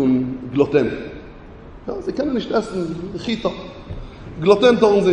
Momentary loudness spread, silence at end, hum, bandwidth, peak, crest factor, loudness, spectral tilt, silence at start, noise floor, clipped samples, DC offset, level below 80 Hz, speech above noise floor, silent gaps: 21 LU; 0 s; none; 9.4 kHz; -2 dBFS; 18 dB; -19 LUFS; -6.5 dB/octave; 0 s; -39 dBFS; under 0.1%; under 0.1%; -42 dBFS; 21 dB; none